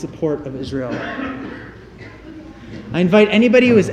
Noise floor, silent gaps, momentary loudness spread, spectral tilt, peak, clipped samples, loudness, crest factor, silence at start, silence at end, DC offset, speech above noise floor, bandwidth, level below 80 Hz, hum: -38 dBFS; none; 25 LU; -6.5 dB/octave; 0 dBFS; under 0.1%; -16 LUFS; 16 dB; 0 s; 0 s; under 0.1%; 22 dB; 9.6 kHz; -46 dBFS; none